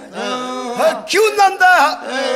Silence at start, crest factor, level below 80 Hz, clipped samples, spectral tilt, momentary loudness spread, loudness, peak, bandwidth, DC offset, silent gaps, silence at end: 0 s; 14 dB; -60 dBFS; under 0.1%; -1.5 dB/octave; 12 LU; -14 LUFS; -2 dBFS; 16 kHz; under 0.1%; none; 0 s